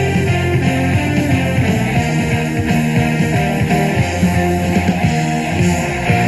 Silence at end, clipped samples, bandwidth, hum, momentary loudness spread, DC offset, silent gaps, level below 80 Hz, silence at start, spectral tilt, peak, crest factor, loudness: 0 s; under 0.1%; 13 kHz; none; 2 LU; under 0.1%; none; -34 dBFS; 0 s; -6 dB/octave; 0 dBFS; 14 dB; -15 LUFS